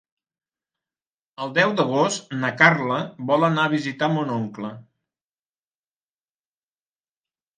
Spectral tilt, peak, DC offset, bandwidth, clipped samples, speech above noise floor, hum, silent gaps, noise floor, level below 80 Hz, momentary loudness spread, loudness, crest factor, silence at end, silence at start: -5 dB/octave; 0 dBFS; under 0.1%; 9.8 kHz; under 0.1%; over 69 dB; none; none; under -90 dBFS; -72 dBFS; 13 LU; -21 LUFS; 24 dB; 2.75 s; 1.4 s